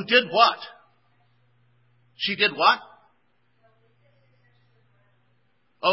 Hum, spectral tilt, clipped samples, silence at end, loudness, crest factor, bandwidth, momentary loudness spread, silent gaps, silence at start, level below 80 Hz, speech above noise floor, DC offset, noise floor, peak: none; -6.5 dB/octave; under 0.1%; 0 s; -21 LUFS; 24 dB; 5.8 kHz; 14 LU; none; 0 s; -80 dBFS; 48 dB; under 0.1%; -69 dBFS; -2 dBFS